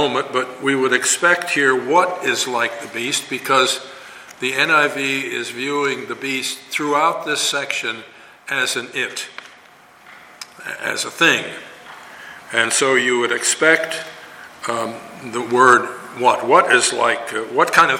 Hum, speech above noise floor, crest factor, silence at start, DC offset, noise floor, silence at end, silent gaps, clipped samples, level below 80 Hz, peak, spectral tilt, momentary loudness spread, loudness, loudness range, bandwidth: none; 29 dB; 20 dB; 0 s; under 0.1%; -47 dBFS; 0 s; none; under 0.1%; -66 dBFS; 0 dBFS; -2 dB/octave; 19 LU; -17 LUFS; 6 LU; 17 kHz